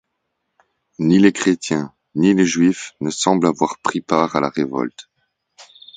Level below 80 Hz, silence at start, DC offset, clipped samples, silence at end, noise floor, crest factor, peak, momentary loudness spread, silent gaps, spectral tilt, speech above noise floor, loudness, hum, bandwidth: -58 dBFS; 1 s; under 0.1%; under 0.1%; 0.35 s; -74 dBFS; 18 dB; 0 dBFS; 11 LU; none; -5 dB/octave; 57 dB; -18 LUFS; none; 9.4 kHz